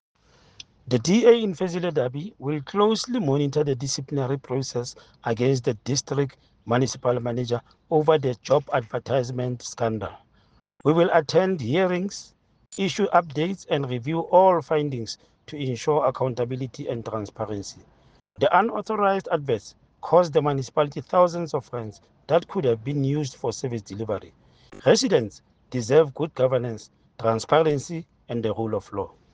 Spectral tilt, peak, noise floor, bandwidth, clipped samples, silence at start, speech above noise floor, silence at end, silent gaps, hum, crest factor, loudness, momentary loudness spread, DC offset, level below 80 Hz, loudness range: -5.5 dB/octave; -4 dBFS; -61 dBFS; 9.6 kHz; under 0.1%; 0.85 s; 38 dB; 0.25 s; none; none; 20 dB; -24 LUFS; 13 LU; under 0.1%; -60 dBFS; 3 LU